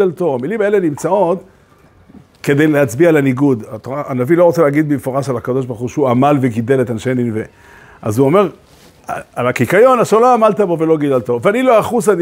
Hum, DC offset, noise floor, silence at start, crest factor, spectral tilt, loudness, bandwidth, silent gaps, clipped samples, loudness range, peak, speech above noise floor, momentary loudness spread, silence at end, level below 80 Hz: none; under 0.1%; -47 dBFS; 0 s; 14 dB; -7 dB/octave; -14 LUFS; 16 kHz; none; under 0.1%; 4 LU; 0 dBFS; 34 dB; 11 LU; 0 s; -54 dBFS